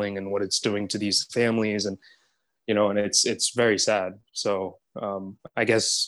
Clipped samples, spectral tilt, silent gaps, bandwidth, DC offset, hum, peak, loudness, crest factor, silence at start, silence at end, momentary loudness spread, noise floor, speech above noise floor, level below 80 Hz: under 0.1%; -2.5 dB/octave; none; 13 kHz; under 0.1%; none; -6 dBFS; -25 LUFS; 20 dB; 0 s; 0 s; 13 LU; -69 dBFS; 44 dB; -70 dBFS